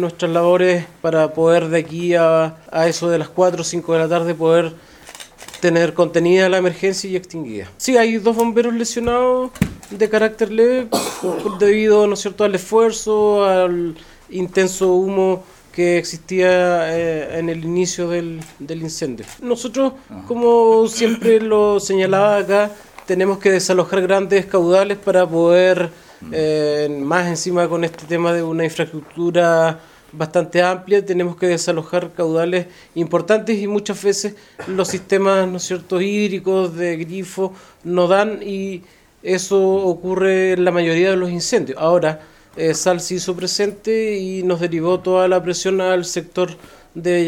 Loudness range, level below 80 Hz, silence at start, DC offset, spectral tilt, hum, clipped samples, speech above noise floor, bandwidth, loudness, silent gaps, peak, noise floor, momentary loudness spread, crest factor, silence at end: 4 LU; -52 dBFS; 0 s; under 0.1%; -5 dB/octave; none; under 0.1%; 22 dB; 16.5 kHz; -17 LUFS; none; 0 dBFS; -39 dBFS; 11 LU; 16 dB; 0 s